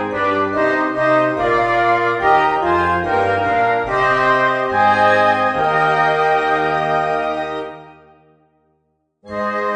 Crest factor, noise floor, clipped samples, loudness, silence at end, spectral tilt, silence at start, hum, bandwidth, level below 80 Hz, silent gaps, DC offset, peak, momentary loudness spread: 16 dB; -66 dBFS; under 0.1%; -16 LUFS; 0 s; -6 dB/octave; 0 s; none; 9.8 kHz; -46 dBFS; none; under 0.1%; -2 dBFS; 7 LU